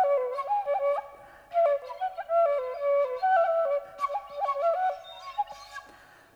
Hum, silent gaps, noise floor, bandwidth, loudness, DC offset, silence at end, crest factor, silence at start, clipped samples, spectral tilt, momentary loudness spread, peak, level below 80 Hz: none; none; -54 dBFS; 9.6 kHz; -28 LUFS; under 0.1%; 0.55 s; 14 dB; 0 s; under 0.1%; -2.5 dB/octave; 12 LU; -14 dBFS; -70 dBFS